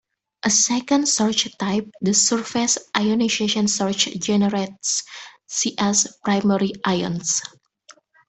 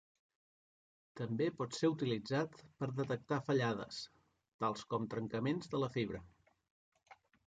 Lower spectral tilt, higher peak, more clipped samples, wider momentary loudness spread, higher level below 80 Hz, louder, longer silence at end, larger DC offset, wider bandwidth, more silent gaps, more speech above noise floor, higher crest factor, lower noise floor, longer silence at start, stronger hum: second, -3 dB/octave vs -6.5 dB/octave; first, -2 dBFS vs -22 dBFS; neither; about the same, 7 LU vs 9 LU; first, -60 dBFS vs -72 dBFS; first, -20 LUFS vs -39 LUFS; first, 0.8 s vs 0.35 s; neither; about the same, 8.6 kHz vs 9 kHz; second, none vs 4.54-4.59 s, 6.71-6.92 s; second, 31 dB vs over 52 dB; about the same, 20 dB vs 18 dB; second, -52 dBFS vs under -90 dBFS; second, 0.45 s vs 1.15 s; neither